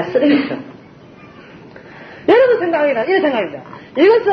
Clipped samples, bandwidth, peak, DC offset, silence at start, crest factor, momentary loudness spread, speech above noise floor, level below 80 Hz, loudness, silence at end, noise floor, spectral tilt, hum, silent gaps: under 0.1%; 6.2 kHz; -2 dBFS; under 0.1%; 0 s; 14 dB; 21 LU; 26 dB; -60 dBFS; -15 LUFS; 0 s; -40 dBFS; -7 dB/octave; none; none